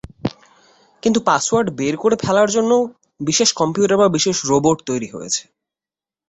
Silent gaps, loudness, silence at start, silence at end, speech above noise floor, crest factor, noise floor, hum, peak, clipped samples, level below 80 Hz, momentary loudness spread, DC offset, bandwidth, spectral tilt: none; -18 LUFS; 0.25 s; 0.9 s; over 73 dB; 18 dB; under -90 dBFS; none; 0 dBFS; under 0.1%; -52 dBFS; 10 LU; under 0.1%; 8.4 kHz; -4 dB/octave